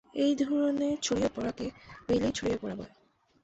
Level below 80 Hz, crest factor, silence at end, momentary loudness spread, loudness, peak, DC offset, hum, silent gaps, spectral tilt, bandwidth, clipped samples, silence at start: -56 dBFS; 14 dB; 0.55 s; 12 LU; -31 LUFS; -16 dBFS; under 0.1%; none; none; -4.5 dB/octave; 8.2 kHz; under 0.1%; 0.15 s